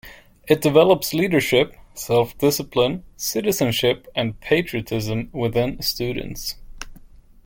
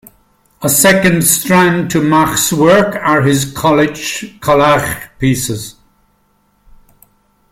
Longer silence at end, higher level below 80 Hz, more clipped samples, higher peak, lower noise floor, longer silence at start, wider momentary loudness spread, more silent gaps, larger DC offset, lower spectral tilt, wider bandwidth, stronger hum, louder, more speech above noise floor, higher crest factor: second, 0.45 s vs 1.8 s; about the same, -44 dBFS vs -42 dBFS; neither; about the same, -2 dBFS vs 0 dBFS; second, -45 dBFS vs -57 dBFS; second, 0.05 s vs 0.6 s; about the same, 13 LU vs 11 LU; neither; neither; about the same, -4.5 dB/octave vs -4 dB/octave; about the same, 17 kHz vs 17 kHz; neither; second, -21 LUFS vs -11 LUFS; second, 25 dB vs 45 dB; first, 20 dB vs 14 dB